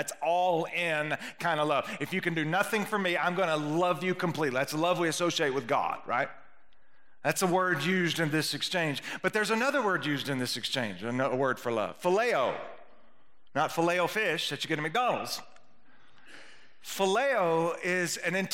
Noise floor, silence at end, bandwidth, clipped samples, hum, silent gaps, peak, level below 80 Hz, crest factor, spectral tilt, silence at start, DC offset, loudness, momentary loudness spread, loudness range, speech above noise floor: -67 dBFS; 0 s; 16 kHz; under 0.1%; none; none; -10 dBFS; -76 dBFS; 20 dB; -4 dB/octave; 0 s; 0.2%; -29 LUFS; 5 LU; 2 LU; 38 dB